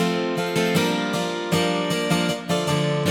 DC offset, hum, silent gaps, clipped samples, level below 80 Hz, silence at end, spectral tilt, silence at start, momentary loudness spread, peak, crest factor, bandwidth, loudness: under 0.1%; none; none; under 0.1%; -60 dBFS; 0 s; -5 dB/octave; 0 s; 3 LU; -6 dBFS; 16 dB; 17 kHz; -22 LUFS